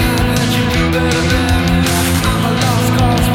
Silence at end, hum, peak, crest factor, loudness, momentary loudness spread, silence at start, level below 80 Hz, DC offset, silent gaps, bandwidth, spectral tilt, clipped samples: 0 s; none; 0 dBFS; 12 dB; -13 LUFS; 1 LU; 0 s; -22 dBFS; under 0.1%; none; 17 kHz; -5 dB/octave; under 0.1%